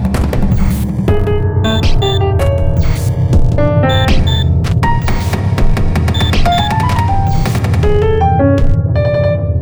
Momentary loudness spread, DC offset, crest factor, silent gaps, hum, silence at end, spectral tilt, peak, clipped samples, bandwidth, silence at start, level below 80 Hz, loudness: 3 LU; 1%; 10 dB; none; none; 0 s; -7 dB/octave; 0 dBFS; under 0.1%; over 20 kHz; 0 s; -16 dBFS; -13 LUFS